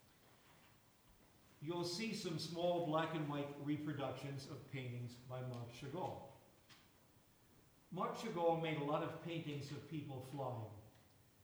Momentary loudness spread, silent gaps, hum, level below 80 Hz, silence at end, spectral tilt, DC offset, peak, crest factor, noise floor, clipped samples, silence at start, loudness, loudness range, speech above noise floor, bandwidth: 15 LU; none; none; -78 dBFS; 0.4 s; -6 dB/octave; under 0.1%; -26 dBFS; 20 dB; -70 dBFS; under 0.1%; 0.25 s; -44 LUFS; 8 LU; 26 dB; over 20 kHz